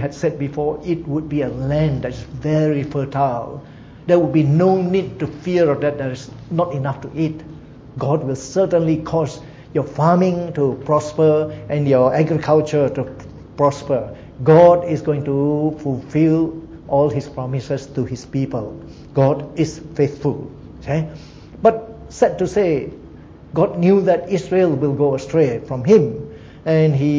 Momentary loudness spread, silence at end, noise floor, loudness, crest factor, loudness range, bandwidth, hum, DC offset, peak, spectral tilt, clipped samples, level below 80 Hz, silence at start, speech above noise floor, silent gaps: 14 LU; 0 s; -39 dBFS; -18 LUFS; 18 dB; 5 LU; 7.8 kHz; none; under 0.1%; 0 dBFS; -8 dB/octave; under 0.1%; -44 dBFS; 0 s; 22 dB; none